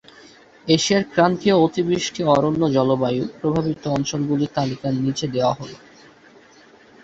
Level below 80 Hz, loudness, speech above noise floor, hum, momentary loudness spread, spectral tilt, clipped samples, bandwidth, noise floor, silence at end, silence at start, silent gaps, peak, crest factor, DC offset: -54 dBFS; -20 LUFS; 30 dB; none; 6 LU; -5.5 dB/octave; under 0.1%; 8.2 kHz; -49 dBFS; 1.25 s; 0.65 s; none; -2 dBFS; 18 dB; under 0.1%